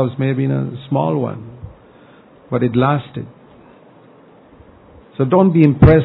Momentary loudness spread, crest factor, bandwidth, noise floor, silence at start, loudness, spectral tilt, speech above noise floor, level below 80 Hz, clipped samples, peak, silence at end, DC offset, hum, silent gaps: 25 LU; 16 dB; 4.4 kHz; -45 dBFS; 0 s; -16 LUFS; -12 dB/octave; 31 dB; -34 dBFS; under 0.1%; 0 dBFS; 0 s; under 0.1%; none; none